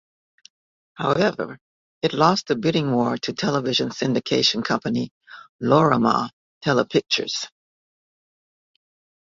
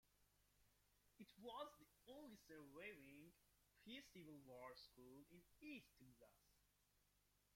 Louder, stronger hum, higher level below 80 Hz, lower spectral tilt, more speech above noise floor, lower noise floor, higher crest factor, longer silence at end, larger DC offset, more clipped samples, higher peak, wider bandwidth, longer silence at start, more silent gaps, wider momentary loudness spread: first, -21 LUFS vs -62 LUFS; second, none vs 50 Hz at -85 dBFS; first, -60 dBFS vs -86 dBFS; about the same, -5 dB/octave vs -4.5 dB/octave; first, over 69 dB vs 21 dB; first, under -90 dBFS vs -83 dBFS; about the same, 22 dB vs 22 dB; first, 1.9 s vs 0 s; neither; neither; first, -2 dBFS vs -42 dBFS; second, 7.8 kHz vs 16.5 kHz; first, 1 s vs 0.05 s; first, 1.61-2.01 s, 5.11-5.21 s, 5.49-5.59 s, 6.33-6.61 s vs none; about the same, 10 LU vs 9 LU